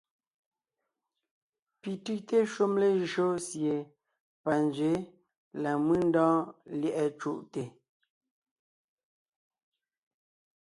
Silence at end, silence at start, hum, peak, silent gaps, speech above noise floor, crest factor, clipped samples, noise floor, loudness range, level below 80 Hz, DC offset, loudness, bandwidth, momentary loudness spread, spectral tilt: 2.9 s; 1.85 s; none; -14 dBFS; 4.20-4.44 s, 5.37-5.51 s; 58 dB; 18 dB; under 0.1%; -87 dBFS; 8 LU; -70 dBFS; under 0.1%; -30 LUFS; 11.5 kHz; 14 LU; -6 dB/octave